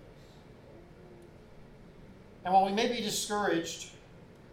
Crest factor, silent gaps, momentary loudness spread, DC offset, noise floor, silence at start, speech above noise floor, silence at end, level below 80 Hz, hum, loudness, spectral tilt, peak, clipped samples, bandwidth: 22 dB; none; 27 LU; under 0.1%; -53 dBFS; 0 s; 24 dB; 0.3 s; -62 dBFS; none; -30 LUFS; -3.5 dB/octave; -12 dBFS; under 0.1%; 16.5 kHz